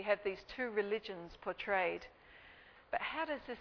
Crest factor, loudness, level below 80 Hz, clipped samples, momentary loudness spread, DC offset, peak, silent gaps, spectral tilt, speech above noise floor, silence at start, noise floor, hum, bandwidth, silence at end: 22 dB; -39 LUFS; -68 dBFS; under 0.1%; 22 LU; under 0.1%; -18 dBFS; none; -1.5 dB/octave; 21 dB; 0 s; -60 dBFS; none; 5.4 kHz; 0 s